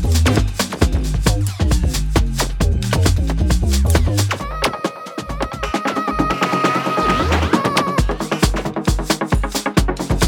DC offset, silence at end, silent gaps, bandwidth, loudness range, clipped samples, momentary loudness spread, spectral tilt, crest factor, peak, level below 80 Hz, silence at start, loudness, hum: under 0.1%; 0 s; none; 18 kHz; 2 LU; under 0.1%; 5 LU; -5 dB/octave; 16 dB; 0 dBFS; -22 dBFS; 0 s; -18 LUFS; none